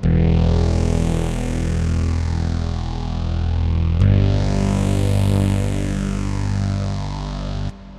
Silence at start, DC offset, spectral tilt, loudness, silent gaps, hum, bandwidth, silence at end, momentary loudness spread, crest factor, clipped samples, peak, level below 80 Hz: 0 s; under 0.1%; -7 dB/octave; -20 LUFS; none; none; 12 kHz; 0 s; 9 LU; 14 dB; under 0.1%; -4 dBFS; -24 dBFS